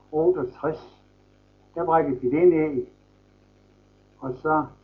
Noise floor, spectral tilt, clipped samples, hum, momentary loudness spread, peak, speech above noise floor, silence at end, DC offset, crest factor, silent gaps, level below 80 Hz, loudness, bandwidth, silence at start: -58 dBFS; -10.5 dB/octave; under 0.1%; 50 Hz at -55 dBFS; 18 LU; -8 dBFS; 35 dB; 0.15 s; under 0.1%; 18 dB; none; -56 dBFS; -24 LUFS; 5.2 kHz; 0.1 s